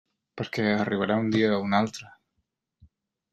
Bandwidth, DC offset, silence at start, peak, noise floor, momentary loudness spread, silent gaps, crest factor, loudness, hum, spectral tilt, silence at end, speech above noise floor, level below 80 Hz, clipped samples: 11.5 kHz; under 0.1%; 0.35 s; -8 dBFS; -79 dBFS; 10 LU; none; 20 dB; -26 LUFS; none; -6 dB/octave; 1.25 s; 53 dB; -64 dBFS; under 0.1%